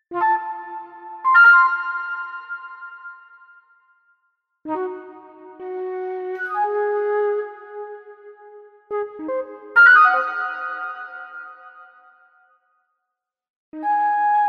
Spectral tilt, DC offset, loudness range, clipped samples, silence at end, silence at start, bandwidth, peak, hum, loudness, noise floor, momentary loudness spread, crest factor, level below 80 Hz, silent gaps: -3.5 dB/octave; under 0.1%; 16 LU; under 0.1%; 0 s; 0.1 s; 6 kHz; -4 dBFS; none; -18 LUFS; -82 dBFS; 26 LU; 18 dB; -76 dBFS; 13.50-13.72 s